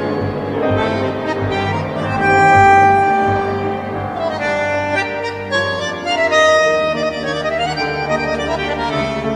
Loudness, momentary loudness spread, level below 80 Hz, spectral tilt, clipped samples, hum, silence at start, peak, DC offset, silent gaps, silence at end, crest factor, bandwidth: -16 LUFS; 10 LU; -42 dBFS; -5 dB/octave; under 0.1%; none; 0 s; 0 dBFS; under 0.1%; none; 0 s; 14 dB; 10 kHz